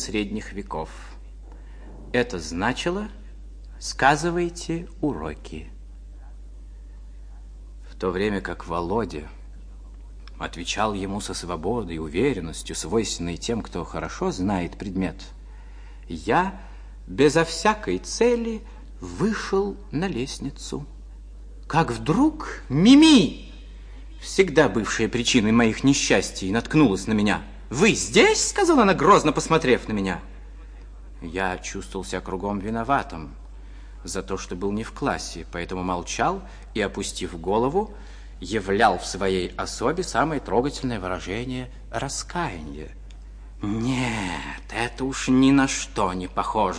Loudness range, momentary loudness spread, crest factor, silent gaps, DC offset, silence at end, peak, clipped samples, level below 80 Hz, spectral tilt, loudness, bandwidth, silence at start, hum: 11 LU; 25 LU; 20 dB; none; under 0.1%; 0 s; -4 dBFS; under 0.1%; -40 dBFS; -4.5 dB/octave; -23 LUFS; 10.5 kHz; 0 s; none